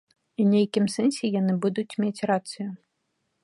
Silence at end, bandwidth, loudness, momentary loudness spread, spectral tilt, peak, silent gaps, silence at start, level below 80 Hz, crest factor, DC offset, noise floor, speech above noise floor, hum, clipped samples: 0.65 s; 11.5 kHz; -25 LUFS; 13 LU; -6.5 dB/octave; -10 dBFS; none; 0.4 s; -74 dBFS; 16 dB; under 0.1%; -76 dBFS; 52 dB; none; under 0.1%